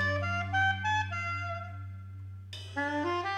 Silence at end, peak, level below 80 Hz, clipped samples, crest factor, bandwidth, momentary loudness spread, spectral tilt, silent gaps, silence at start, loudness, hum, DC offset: 0 s; -18 dBFS; -66 dBFS; under 0.1%; 14 dB; 9.6 kHz; 16 LU; -5 dB/octave; none; 0 s; -32 LUFS; none; under 0.1%